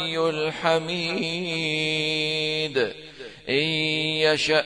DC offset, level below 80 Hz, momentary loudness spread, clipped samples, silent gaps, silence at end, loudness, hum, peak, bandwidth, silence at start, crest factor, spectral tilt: 0.1%; -62 dBFS; 5 LU; under 0.1%; none; 0 s; -23 LUFS; none; -6 dBFS; 10.5 kHz; 0 s; 18 dB; -4 dB/octave